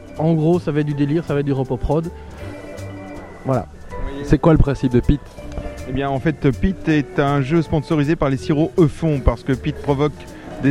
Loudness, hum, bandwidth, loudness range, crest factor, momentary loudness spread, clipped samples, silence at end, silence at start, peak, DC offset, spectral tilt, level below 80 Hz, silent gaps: -19 LUFS; none; 11.5 kHz; 4 LU; 18 dB; 16 LU; under 0.1%; 0 s; 0 s; 0 dBFS; under 0.1%; -8 dB/octave; -30 dBFS; none